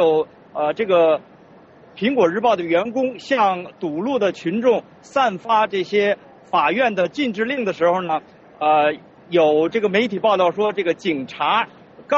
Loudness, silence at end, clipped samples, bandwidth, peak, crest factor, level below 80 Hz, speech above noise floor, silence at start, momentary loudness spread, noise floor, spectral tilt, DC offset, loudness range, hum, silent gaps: -20 LUFS; 0 s; under 0.1%; 7.8 kHz; -4 dBFS; 14 dB; -64 dBFS; 28 dB; 0 s; 7 LU; -47 dBFS; -3 dB/octave; under 0.1%; 2 LU; none; none